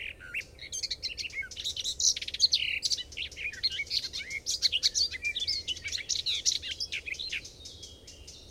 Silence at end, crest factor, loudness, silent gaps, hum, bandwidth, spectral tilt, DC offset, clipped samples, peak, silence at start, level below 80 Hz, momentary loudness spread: 0 s; 22 dB; -30 LUFS; none; none; 16.5 kHz; 1.5 dB/octave; under 0.1%; under 0.1%; -10 dBFS; 0 s; -56 dBFS; 13 LU